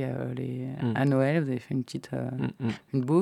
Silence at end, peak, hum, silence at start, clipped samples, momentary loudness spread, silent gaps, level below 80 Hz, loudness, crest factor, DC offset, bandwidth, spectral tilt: 0 s; -12 dBFS; none; 0 s; under 0.1%; 9 LU; none; -66 dBFS; -29 LUFS; 16 dB; under 0.1%; 12 kHz; -8 dB/octave